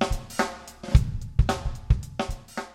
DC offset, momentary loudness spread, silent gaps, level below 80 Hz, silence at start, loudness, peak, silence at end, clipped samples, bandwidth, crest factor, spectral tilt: under 0.1%; 9 LU; none; -28 dBFS; 0 s; -27 LUFS; -4 dBFS; 0.05 s; under 0.1%; 15.5 kHz; 22 dB; -6 dB/octave